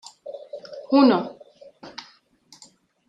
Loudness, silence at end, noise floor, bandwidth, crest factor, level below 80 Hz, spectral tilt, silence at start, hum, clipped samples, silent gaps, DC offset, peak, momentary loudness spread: -19 LUFS; 1.2 s; -55 dBFS; 8.8 kHz; 20 dB; -74 dBFS; -6 dB/octave; 0.25 s; none; under 0.1%; none; under 0.1%; -6 dBFS; 23 LU